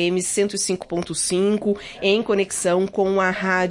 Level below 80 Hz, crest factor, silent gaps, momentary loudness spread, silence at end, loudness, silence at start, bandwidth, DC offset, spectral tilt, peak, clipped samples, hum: -54 dBFS; 14 dB; none; 4 LU; 0 s; -21 LUFS; 0 s; 11.5 kHz; under 0.1%; -3.5 dB/octave; -6 dBFS; under 0.1%; none